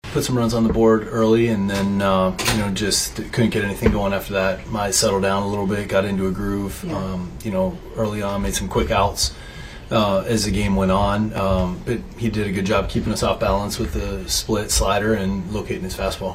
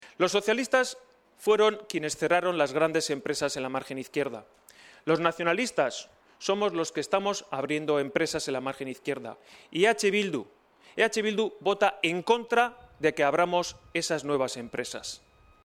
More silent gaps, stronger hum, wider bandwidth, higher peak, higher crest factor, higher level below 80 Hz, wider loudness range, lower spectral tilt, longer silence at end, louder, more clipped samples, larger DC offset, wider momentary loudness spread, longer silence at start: neither; neither; about the same, 16 kHz vs 15.5 kHz; first, -2 dBFS vs -8 dBFS; about the same, 18 dB vs 20 dB; first, -32 dBFS vs -68 dBFS; about the same, 4 LU vs 3 LU; about the same, -4.5 dB/octave vs -3.5 dB/octave; second, 0 s vs 0.5 s; first, -21 LUFS vs -28 LUFS; neither; neither; about the same, 8 LU vs 10 LU; about the same, 0.05 s vs 0 s